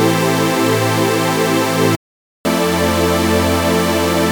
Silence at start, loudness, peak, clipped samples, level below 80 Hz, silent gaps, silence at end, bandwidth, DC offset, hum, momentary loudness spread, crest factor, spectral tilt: 0 s; -15 LUFS; 0 dBFS; under 0.1%; -38 dBFS; 1.96-2.44 s; 0 s; over 20 kHz; 0.3%; none; 3 LU; 14 dB; -4.5 dB/octave